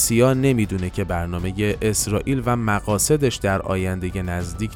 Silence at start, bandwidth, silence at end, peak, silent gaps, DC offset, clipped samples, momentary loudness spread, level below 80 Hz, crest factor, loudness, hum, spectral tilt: 0 s; 17.5 kHz; 0 s; -4 dBFS; none; under 0.1%; under 0.1%; 9 LU; -36 dBFS; 16 dB; -21 LUFS; none; -5 dB/octave